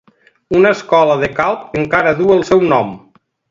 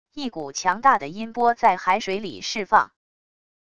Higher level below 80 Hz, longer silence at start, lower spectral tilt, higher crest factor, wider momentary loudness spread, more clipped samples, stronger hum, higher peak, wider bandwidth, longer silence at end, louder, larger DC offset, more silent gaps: first, -46 dBFS vs -60 dBFS; first, 0.5 s vs 0.15 s; first, -6.5 dB/octave vs -3 dB/octave; second, 14 dB vs 20 dB; second, 6 LU vs 12 LU; neither; neither; about the same, 0 dBFS vs -2 dBFS; second, 7.6 kHz vs 11 kHz; second, 0.5 s vs 0.8 s; first, -13 LUFS vs -22 LUFS; second, under 0.1% vs 0.5%; neither